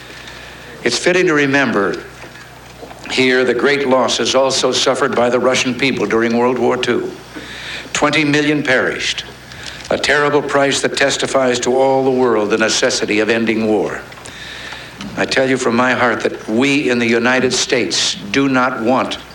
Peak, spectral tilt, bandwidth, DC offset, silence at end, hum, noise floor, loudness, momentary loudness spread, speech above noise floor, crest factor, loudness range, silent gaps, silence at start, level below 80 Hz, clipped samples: -2 dBFS; -3.5 dB/octave; 17 kHz; under 0.1%; 0 s; none; -36 dBFS; -14 LUFS; 16 LU; 22 dB; 14 dB; 3 LU; none; 0 s; -48 dBFS; under 0.1%